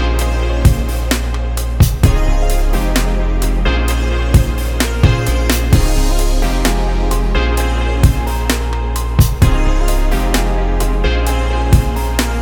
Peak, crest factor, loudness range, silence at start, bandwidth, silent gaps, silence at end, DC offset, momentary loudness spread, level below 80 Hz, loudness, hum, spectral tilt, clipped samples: 0 dBFS; 12 dB; 1 LU; 0 s; over 20 kHz; none; 0 s; under 0.1%; 4 LU; -14 dBFS; -15 LUFS; none; -5.5 dB/octave; under 0.1%